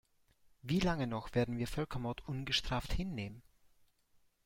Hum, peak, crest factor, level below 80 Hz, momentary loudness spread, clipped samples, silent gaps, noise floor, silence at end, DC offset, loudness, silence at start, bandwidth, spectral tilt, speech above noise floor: none; -20 dBFS; 20 dB; -50 dBFS; 8 LU; under 0.1%; none; -72 dBFS; 1.05 s; under 0.1%; -37 LUFS; 0.65 s; 16.5 kHz; -5.5 dB/octave; 35 dB